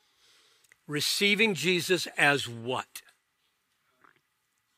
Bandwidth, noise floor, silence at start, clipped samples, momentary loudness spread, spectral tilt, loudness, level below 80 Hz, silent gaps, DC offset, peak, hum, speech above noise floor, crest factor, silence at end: 16 kHz; -76 dBFS; 0.9 s; under 0.1%; 13 LU; -3 dB/octave; -26 LUFS; -82 dBFS; none; under 0.1%; -8 dBFS; none; 49 dB; 24 dB; 1.75 s